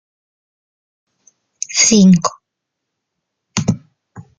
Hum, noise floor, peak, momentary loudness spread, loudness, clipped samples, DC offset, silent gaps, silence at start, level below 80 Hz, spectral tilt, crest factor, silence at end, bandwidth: none; -78 dBFS; 0 dBFS; 16 LU; -13 LUFS; under 0.1%; under 0.1%; none; 1.7 s; -52 dBFS; -4 dB/octave; 18 dB; 0.2 s; 9.4 kHz